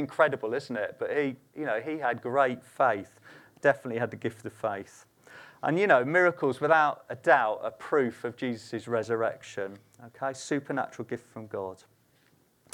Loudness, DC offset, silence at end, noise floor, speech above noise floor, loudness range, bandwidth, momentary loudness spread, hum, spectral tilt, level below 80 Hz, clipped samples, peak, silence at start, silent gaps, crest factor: -29 LUFS; under 0.1%; 1 s; -66 dBFS; 37 dB; 8 LU; 18 kHz; 14 LU; none; -5.5 dB/octave; -80 dBFS; under 0.1%; -6 dBFS; 0 s; none; 22 dB